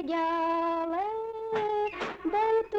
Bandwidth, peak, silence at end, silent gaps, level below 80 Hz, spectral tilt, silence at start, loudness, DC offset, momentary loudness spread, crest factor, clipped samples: 7.8 kHz; -20 dBFS; 0 s; none; -62 dBFS; -5.5 dB/octave; 0 s; -30 LUFS; under 0.1%; 6 LU; 10 dB; under 0.1%